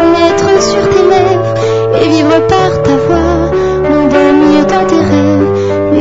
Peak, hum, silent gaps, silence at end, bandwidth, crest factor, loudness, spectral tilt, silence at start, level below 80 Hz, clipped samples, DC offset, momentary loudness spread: 0 dBFS; none; none; 0 s; 7.8 kHz; 8 dB; -9 LUFS; -6 dB/octave; 0 s; -30 dBFS; 0.6%; 1%; 4 LU